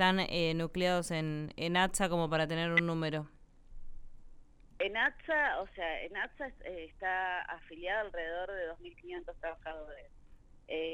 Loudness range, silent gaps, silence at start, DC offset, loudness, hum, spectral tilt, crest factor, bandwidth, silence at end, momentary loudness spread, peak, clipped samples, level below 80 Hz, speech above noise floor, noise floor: 7 LU; none; 0 s; under 0.1%; -34 LUFS; none; -4.5 dB/octave; 22 dB; 16 kHz; 0 s; 15 LU; -14 dBFS; under 0.1%; -54 dBFS; 22 dB; -57 dBFS